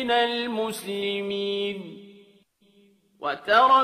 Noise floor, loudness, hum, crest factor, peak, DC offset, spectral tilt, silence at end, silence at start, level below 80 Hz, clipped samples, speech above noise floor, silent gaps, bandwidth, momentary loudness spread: -60 dBFS; -25 LUFS; none; 20 dB; -6 dBFS; under 0.1%; -3.5 dB/octave; 0 s; 0 s; -68 dBFS; under 0.1%; 36 dB; none; 15 kHz; 16 LU